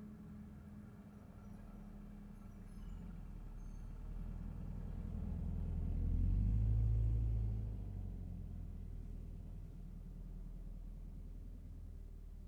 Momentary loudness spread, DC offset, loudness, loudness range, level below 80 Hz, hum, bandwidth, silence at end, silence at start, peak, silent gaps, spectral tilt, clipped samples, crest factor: 18 LU; under 0.1%; -45 LUFS; 14 LU; -44 dBFS; none; 3.3 kHz; 0 s; 0 s; -26 dBFS; none; -9.5 dB/octave; under 0.1%; 16 dB